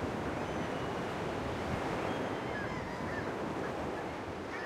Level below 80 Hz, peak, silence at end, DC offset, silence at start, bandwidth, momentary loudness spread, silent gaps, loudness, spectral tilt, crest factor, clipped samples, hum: -54 dBFS; -22 dBFS; 0 s; under 0.1%; 0 s; 16 kHz; 3 LU; none; -37 LUFS; -6 dB/octave; 14 dB; under 0.1%; none